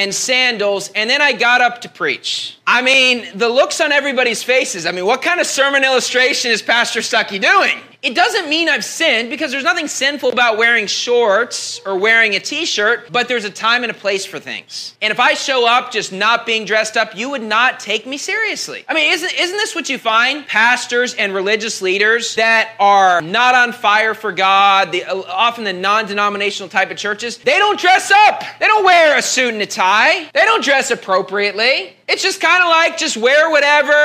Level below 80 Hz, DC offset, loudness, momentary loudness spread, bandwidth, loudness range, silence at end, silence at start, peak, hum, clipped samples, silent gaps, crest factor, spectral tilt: -76 dBFS; under 0.1%; -14 LUFS; 8 LU; 15.5 kHz; 3 LU; 0 s; 0 s; 0 dBFS; none; under 0.1%; none; 14 dB; -1 dB/octave